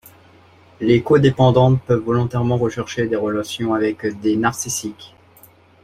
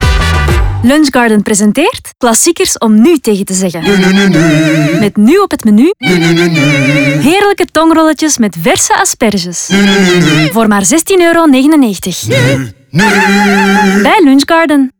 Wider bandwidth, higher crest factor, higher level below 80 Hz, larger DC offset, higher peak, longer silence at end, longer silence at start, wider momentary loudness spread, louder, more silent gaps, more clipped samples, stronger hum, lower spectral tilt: second, 15.5 kHz vs over 20 kHz; first, 16 dB vs 8 dB; second, -48 dBFS vs -24 dBFS; neither; about the same, -2 dBFS vs 0 dBFS; first, 0.75 s vs 0.1 s; first, 0.8 s vs 0 s; first, 10 LU vs 5 LU; second, -18 LUFS vs -8 LUFS; neither; neither; neither; first, -6 dB/octave vs -4.5 dB/octave